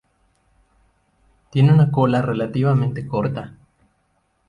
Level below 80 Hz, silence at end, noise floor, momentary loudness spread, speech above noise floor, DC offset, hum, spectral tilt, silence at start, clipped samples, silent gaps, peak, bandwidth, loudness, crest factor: -52 dBFS; 1 s; -66 dBFS; 12 LU; 49 dB; under 0.1%; none; -9.5 dB/octave; 1.55 s; under 0.1%; none; -4 dBFS; 4.9 kHz; -19 LUFS; 16 dB